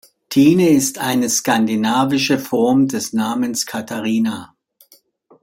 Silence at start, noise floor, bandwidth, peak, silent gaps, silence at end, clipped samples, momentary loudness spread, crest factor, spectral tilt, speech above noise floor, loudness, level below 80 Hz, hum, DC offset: 0.3 s; -53 dBFS; 16.5 kHz; -2 dBFS; none; 0.95 s; under 0.1%; 8 LU; 16 dB; -4 dB/octave; 37 dB; -17 LUFS; -60 dBFS; none; under 0.1%